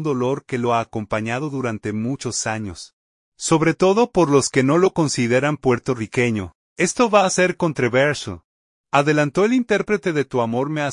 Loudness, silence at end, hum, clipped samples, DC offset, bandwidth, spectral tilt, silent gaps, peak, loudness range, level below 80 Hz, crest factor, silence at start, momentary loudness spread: -19 LUFS; 0 s; none; under 0.1%; under 0.1%; 11 kHz; -5 dB/octave; 2.93-3.32 s, 6.55-6.76 s, 8.44-8.84 s; -2 dBFS; 5 LU; -54 dBFS; 18 dB; 0 s; 9 LU